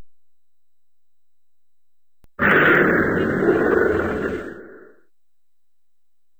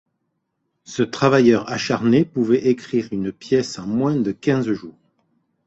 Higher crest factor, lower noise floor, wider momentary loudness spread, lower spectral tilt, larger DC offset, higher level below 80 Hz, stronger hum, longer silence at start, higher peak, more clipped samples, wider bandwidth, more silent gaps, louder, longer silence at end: about the same, 18 dB vs 18 dB; first, -83 dBFS vs -74 dBFS; first, 13 LU vs 10 LU; about the same, -7.5 dB/octave vs -6.5 dB/octave; first, 0.3% vs under 0.1%; first, -48 dBFS vs -58 dBFS; neither; second, 0 s vs 0.9 s; about the same, -4 dBFS vs -2 dBFS; neither; first, over 20 kHz vs 8 kHz; neither; about the same, -18 LUFS vs -20 LUFS; first, 1.6 s vs 0.75 s